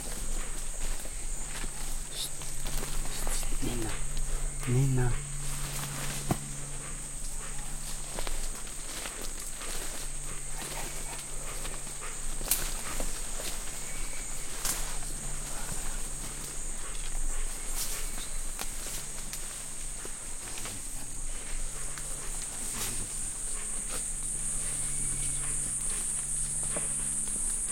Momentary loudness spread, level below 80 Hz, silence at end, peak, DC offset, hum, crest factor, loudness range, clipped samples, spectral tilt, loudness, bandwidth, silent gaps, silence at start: 8 LU; -36 dBFS; 0 s; -8 dBFS; under 0.1%; none; 24 dB; 6 LU; under 0.1%; -2.5 dB/octave; -34 LUFS; 16.5 kHz; none; 0 s